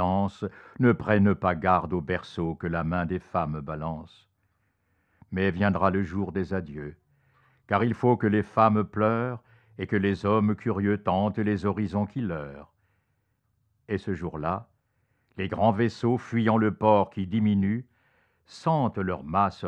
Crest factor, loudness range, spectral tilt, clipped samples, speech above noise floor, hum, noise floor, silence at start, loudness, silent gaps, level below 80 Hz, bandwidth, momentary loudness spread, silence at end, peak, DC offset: 20 dB; 7 LU; -8.5 dB/octave; under 0.1%; 48 dB; none; -73 dBFS; 0 s; -26 LUFS; none; -58 dBFS; 8.2 kHz; 12 LU; 0 s; -6 dBFS; under 0.1%